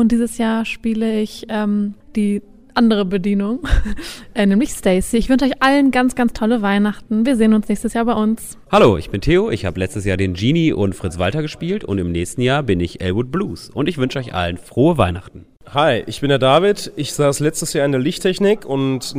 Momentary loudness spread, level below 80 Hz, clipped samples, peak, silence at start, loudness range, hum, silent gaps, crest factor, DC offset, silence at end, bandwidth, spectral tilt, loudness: 8 LU; -34 dBFS; under 0.1%; -2 dBFS; 0 s; 4 LU; none; none; 16 dB; under 0.1%; 0 s; 16 kHz; -5.5 dB/octave; -18 LUFS